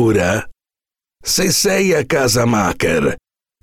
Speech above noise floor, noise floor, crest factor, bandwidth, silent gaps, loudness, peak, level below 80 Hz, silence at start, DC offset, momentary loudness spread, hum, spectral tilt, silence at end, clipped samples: over 75 dB; under -90 dBFS; 10 dB; 18.5 kHz; none; -15 LUFS; -6 dBFS; -40 dBFS; 0 s; under 0.1%; 8 LU; none; -4 dB/octave; 0.45 s; under 0.1%